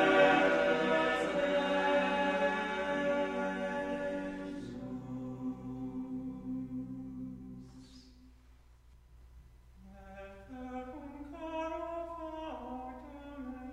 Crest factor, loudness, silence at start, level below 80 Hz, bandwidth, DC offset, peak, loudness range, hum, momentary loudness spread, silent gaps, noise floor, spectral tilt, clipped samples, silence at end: 22 dB; -34 LUFS; 0 s; -58 dBFS; 10.5 kHz; under 0.1%; -14 dBFS; 19 LU; none; 19 LU; none; -60 dBFS; -5.5 dB/octave; under 0.1%; 0 s